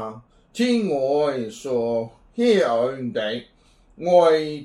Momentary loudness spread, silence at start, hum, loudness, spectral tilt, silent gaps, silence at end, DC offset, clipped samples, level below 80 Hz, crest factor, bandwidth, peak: 14 LU; 0 s; none; -21 LUFS; -5.5 dB/octave; none; 0 s; under 0.1%; under 0.1%; -60 dBFS; 18 dB; 11.5 kHz; -4 dBFS